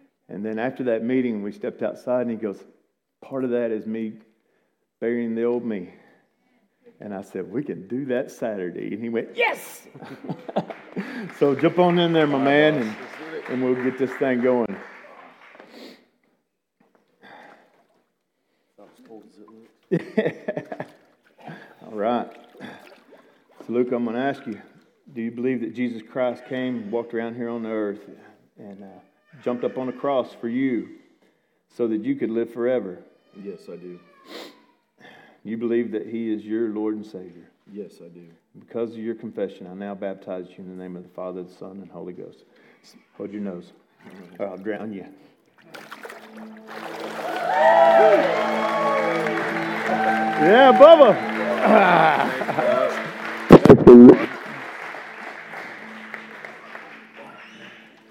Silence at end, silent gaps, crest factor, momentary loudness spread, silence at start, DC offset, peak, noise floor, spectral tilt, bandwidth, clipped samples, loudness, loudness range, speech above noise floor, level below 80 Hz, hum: 0.4 s; none; 22 dB; 24 LU; 0.3 s; under 0.1%; 0 dBFS; -73 dBFS; -7 dB/octave; 14 kHz; 0.1%; -20 LUFS; 21 LU; 52 dB; -54 dBFS; none